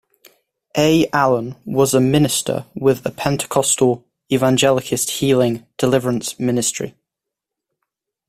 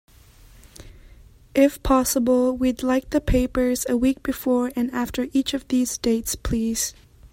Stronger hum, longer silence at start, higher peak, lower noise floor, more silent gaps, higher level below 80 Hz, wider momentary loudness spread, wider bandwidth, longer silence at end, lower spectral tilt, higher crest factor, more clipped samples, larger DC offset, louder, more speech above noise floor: neither; about the same, 0.75 s vs 0.8 s; first, 0 dBFS vs -6 dBFS; first, -83 dBFS vs -49 dBFS; neither; second, -50 dBFS vs -36 dBFS; about the same, 7 LU vs 6 LU; about the same, 16 kHz vs 16.5 kHz; first, 1.4 s vs 0.05 s; about the same, -4.5 dB/octave vs -4.5 dB/octave; about the same, 18 dB vs 18 dB; neither; neither; first, -17 LUFS vs -22 LUFS; first, 67 dB vs 28 dB